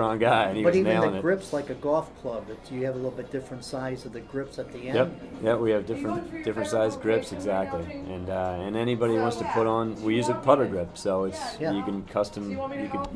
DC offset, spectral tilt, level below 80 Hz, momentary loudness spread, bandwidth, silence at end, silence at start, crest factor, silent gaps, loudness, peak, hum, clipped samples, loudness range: under 0.1%; -6 dB/octave; -54 dBFS; 13 LU; 11 kHz; 0 s; 0 s; 22 dB; none; -27 LUFS; -4 dBFS; none; under 0.1%; 6 LU